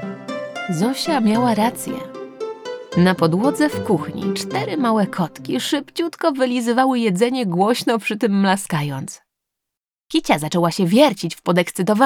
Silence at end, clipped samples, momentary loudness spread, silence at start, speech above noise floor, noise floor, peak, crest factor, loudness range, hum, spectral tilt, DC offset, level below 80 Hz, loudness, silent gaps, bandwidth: 0 s; under 0.1%; 12 LU; 0 s; 67 dB; -85 dBFS; 0 dBFS; 18 dB; 2 LU; none; -5.5 dB/octave; under 0.1%; -58 dBFS; -19 LUFS; none; 18.5 kHz